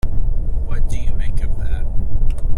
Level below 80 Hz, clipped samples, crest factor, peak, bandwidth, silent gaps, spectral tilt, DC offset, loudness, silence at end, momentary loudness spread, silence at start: -16 dBFS; under 0.1%; 8 dB; -4 dBFS; 3.7 kHz; none; -7 dB/octave; under 0.1%; -25 LUFS; 0 s; 1 LU; 0.05 s